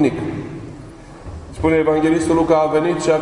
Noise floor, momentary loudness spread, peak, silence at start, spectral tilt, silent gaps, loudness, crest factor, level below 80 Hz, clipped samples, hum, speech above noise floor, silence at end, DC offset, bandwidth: -37 dBFS; 20 LU; -2 dBFS; 0 s; -6.5 dB/octave; none; -17 LUFS; 16 dB; -40 dBFS; under 0.1%; none; 21 dB; 0 s; under 0.1%; 11 kHz